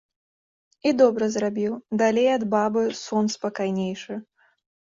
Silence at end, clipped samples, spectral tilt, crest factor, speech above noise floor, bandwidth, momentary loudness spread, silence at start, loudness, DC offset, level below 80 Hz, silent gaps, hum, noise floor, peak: 0.75 s; under 0.1%; -5.5 dB/octave; 18 dB; over 67 dB; 7.8 kHz; 10 LU; 0.85 s; -23 LUFS; under 0.1%; -68 dBFS; none; none; under -90 dBFS; -6 dBFS